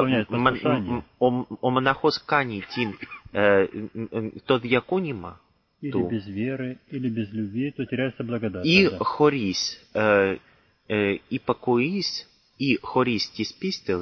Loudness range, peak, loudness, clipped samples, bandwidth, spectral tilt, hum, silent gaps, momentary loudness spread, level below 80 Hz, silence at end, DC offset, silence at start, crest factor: 5 LU; -4 dBFS; -25 LUFS; under 0.1%; 7 kHz; -5.5 dB/octave; none; none; 11 LU; -54 dBFS; 0 s; under 0.1%; 0 s; 20 dB